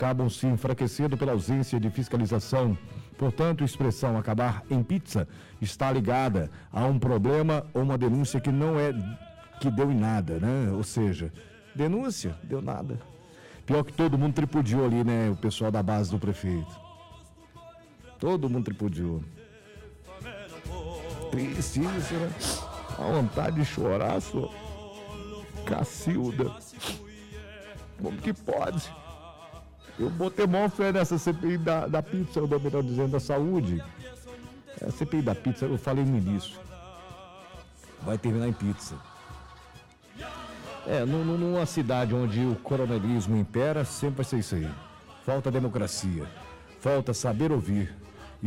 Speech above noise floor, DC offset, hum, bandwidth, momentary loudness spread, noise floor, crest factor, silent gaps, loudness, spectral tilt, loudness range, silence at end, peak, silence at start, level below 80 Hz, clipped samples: 25 dB; under 0.1%; none; 15.5 kHz; 19 LU; -52 dBFS; 10 dB; none; -28 LUFS; -6.5 dB/octave; 7 LU; 0 s; -18 dBFS; 0 s; -50 dBFS; under 0.1%